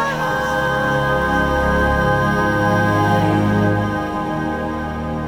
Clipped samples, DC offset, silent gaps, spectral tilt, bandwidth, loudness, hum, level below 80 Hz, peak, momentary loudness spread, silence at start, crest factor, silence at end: under 0.1%; under 0.1%; none; -6.5 dB/octave; 17.5 kHz; -18 LUFS; none; -32 dBFS; -4 dBFS; 6 LU; 0 s; 14 dB; 0 s